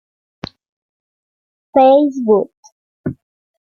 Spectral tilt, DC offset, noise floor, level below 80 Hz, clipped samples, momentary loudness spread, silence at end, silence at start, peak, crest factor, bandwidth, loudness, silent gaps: -7.5 dB/octave; under 0.1%; under -90 dBFS; -58 dBFS; under 0.1%; 23 LU; 0.55 s; 1.75 s; -2 dBFS; 16 dB; 6.8 kHz; -13 LUFS; 2.57-2.63 s, 2.72-3.04 s